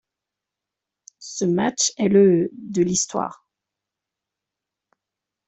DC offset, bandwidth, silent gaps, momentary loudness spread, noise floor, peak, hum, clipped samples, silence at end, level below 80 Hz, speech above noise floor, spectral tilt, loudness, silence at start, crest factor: under 0.1%; 8.4 kHz; none; 15 LU; -86 dBFS; -6 dBFS; none; under 0.1%; 2.15 s; -64 dBFS; 66 dB; -4.5 dB/octave; -20 LUFS; 1.2 s; 18 dB